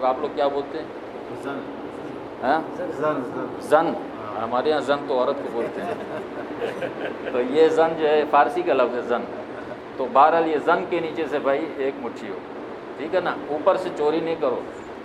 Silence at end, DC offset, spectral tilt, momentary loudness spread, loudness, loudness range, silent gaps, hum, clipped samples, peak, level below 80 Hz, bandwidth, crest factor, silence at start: 0 s; under 0.1%; -6 dB/octave; 15 LU; -23 LUFS; 5 LU; none; none; under 0.1%; -2 dBFS; -62 dBFS; 12 kHz; 20 dB; 0 s